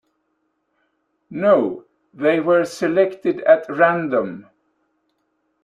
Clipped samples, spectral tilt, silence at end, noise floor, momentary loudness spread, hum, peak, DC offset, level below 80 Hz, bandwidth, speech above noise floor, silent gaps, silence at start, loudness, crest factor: under 0.1%; -6.5 dB/octave; 1.25 s; -70 dBFS; 13 LU; none; -2 dBFS; under 0.1%; -68 dBFS; 12 kHz; 53 dB; none; 1.3 s; -18 LUFS; 18 dB